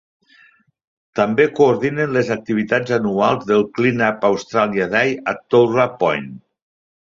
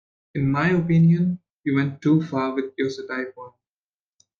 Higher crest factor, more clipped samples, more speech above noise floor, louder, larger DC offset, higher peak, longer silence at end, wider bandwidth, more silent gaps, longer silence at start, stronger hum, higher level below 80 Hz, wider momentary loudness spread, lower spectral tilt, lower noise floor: about the same, 16 dB vs 14 dB; neither; second, 36 dB vs over 69 dB; first, -17 LUFS vs -22 LUFS; neither; first, -2 dBFS vs -8 dBFS; second, 0.7 s vs 0.9 s; first, 7.6 kHz vs 6.8 kHz; second, none vs 1.53-1.58 s; first, 1.15 s vs 0.35 s; neither; about the same, -58 dBFS vs -58 dBFS; second, 6 LU vs 12 LU; second, -6.5 dB/octave vs -8.5 dB/octave; second, -53 dBFS vs under -90 dBFS